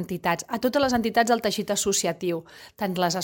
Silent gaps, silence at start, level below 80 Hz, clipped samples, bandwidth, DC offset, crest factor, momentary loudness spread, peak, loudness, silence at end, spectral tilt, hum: none; 0 s; -56 dBFS; under 0.1%; 17 kHz; under 0.1%; 18 dB; 8 LU; -8 dBFS; -25 LUFS; 0 s; -3.5 dB/octave; none